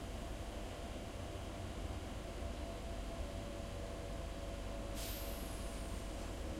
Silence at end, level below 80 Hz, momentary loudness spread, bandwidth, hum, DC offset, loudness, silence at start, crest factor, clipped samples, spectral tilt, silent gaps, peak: 0 s; -48 dBFS; 3 LU; 16.5 kHz; none; under 0.1%; -46 LUFS; 0 s; 12 dB; under 0.1%; -5 dB/octave; none; -32 dBFS